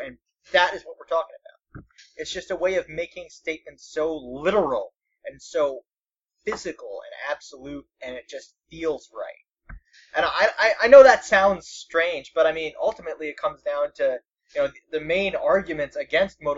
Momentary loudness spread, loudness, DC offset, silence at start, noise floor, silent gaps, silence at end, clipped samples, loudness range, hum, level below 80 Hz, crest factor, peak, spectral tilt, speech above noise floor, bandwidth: 18 LU; -22 LUFS; under 0.1%; 0 s; -88 dBFS; none; 0 s; under 0.1%; 15 LU; none; -56 dBFS; 22 dB; 0 dBFS; -3.5 dB/octave; 65 dB; 8 kHz